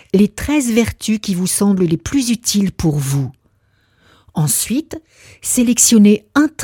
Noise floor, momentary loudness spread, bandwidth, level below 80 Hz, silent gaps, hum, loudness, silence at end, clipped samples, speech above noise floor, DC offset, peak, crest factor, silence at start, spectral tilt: -58 dBFS; 11 LU; 17.5 kHz; -40 dBFS; none; none; -15 LUFS; 0 s; under 0.1%; 44 dB; under 0.1%; 0 dBFS; 16 dB; 0.15 s; -4.5 dB/octave